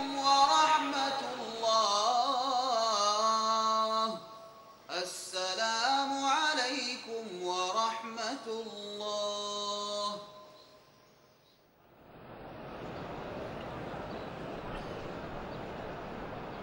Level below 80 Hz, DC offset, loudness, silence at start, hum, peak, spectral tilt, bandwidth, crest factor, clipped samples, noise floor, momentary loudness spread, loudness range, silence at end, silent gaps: -60 dBFS; under 0.1%; -32 LUFS; 0 s; none; -12 dBFS; -2 dB/octave; 16 kHz; 20 dB; under 0.1%; -64 dBFS; 15 LU; 15 LU; 0 s; none